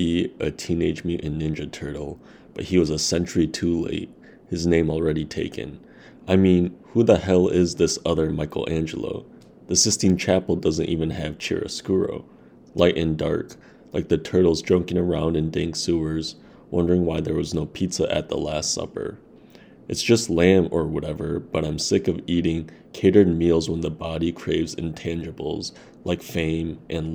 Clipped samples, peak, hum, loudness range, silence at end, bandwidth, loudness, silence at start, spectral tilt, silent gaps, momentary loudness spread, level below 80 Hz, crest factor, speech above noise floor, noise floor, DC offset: under 0.1%; -2 dBFS; none; 4 LU; 0 s; over 20 kHz; -23 LUFS; 0 s; -5 dB/octave; none; 13 LU; -46 dBFS; 22 dB; 26 dB; -48 dBFS; under 0.1%